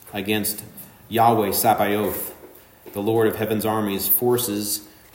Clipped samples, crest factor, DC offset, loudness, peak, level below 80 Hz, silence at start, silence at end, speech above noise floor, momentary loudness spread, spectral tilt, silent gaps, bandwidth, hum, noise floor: under 0.1%; 18 dB; under 0.1%; -21 LUFS; -4 dBFS; -58 dBFS; 0.05 s; 0.25 s; 25 dB; 13 LU; -4 dB/octave; none; 16.5 kHz; none; -46 dBFS